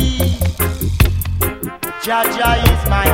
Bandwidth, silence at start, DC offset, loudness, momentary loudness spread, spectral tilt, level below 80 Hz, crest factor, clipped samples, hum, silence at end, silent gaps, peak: 17 kHz; 0 s; under 0.1%; -16 LUFS; 7 LU; -5 dB/octave; -20 dBFS; 16 dB; under 0.1%; none; 0 s; none; 0 dBFS